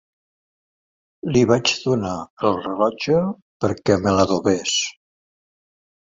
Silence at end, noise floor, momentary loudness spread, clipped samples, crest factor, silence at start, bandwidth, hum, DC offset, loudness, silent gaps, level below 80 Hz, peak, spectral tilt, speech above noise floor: 1.2 s; under -90 dBFS; 9 LU; under 0.1%; 20 dB; 1.25 s; 7.8 kHz; none; under 0.1%; -20 LUFS; 2.30-2.37 s, 3.42-3.60 s; -48 dBFS; -2 dBFS; -4.5 dB/octave; over 71 dB